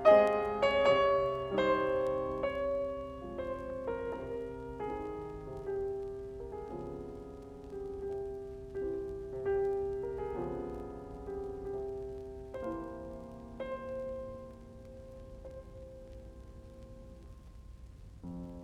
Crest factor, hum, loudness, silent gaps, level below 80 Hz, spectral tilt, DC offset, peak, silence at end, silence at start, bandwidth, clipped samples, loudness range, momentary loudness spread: 24 dB; none; -36 LUFS; none; -54 dBFS; -6.5 dB/octave; under 0.1%; -12 dBFS; 0 s; 0 s; 10.5 kHz; under 0.1%; 16 LU; 21 LU